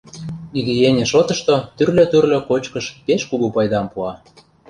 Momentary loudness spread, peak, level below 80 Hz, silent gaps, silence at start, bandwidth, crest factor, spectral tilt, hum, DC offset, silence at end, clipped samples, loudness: 13 LU; -2 dBFS; -50 dBFS; none; 0.15 s; 10.5 kHz; 16 dB; -5.5 dB/octave; none; under 0.1%; 0.55 s; under 0.1%; -17 LUFS